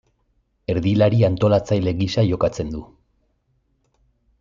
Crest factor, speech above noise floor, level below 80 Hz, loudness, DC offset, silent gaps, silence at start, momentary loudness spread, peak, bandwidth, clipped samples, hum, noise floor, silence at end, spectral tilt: 16 dB; 48 dB; -46 dBFS; -20 LUFS; under 0.1%; none; 0.7 s; 13 LU; -4 dBFS; 7.6 kHz; under 0.1%; none; -66 dBFS; 1.55 s; -7.5 dB/octave